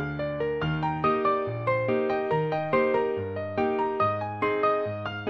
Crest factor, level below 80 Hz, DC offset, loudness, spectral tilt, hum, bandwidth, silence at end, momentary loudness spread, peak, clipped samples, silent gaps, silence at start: 14 dB; -54 dBFS; under 0.1%; -27 LUFS; -8.5 dB/octave; none; 6 kHz; 0 s; 5 LU; -12 dBFS; under 0.1%; none; 0 s